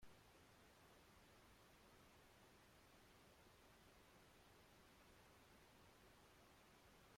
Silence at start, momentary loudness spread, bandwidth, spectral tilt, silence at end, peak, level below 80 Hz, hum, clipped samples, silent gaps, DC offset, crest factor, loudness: 0 s; 0 LU; 16 kHz; -3.5 dB/octave; 0 s; -54 dBFS; -80 dBFS; none; under 0.1%; none; under 0.1%; 16 dB; -70 LUFS